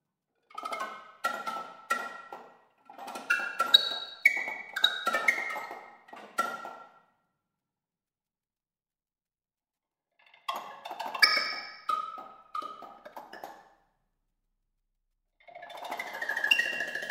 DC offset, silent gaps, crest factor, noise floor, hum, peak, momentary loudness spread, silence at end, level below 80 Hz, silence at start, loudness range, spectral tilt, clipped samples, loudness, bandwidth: under 0.1%; none; 30 dB; under -90 dBFS; none; -4 dBFS; 24 LU; 0 s; -76 dBFS; 0.55 s; 20 LU; 0.5 dB/octave; under 0.1%; -29 LUFS; 16 kHz